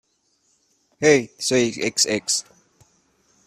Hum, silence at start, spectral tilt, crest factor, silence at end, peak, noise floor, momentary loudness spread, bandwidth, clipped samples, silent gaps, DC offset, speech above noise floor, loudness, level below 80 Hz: none; 1 s; -2.5 dB/octave; 20 dB; 1.05 s; -2 dBFS; -67 dBFS; 5 LU; 15 kHz; under 0.1%; none; under 0.1%; 47 dB; -20 LUFS; -62 dBFS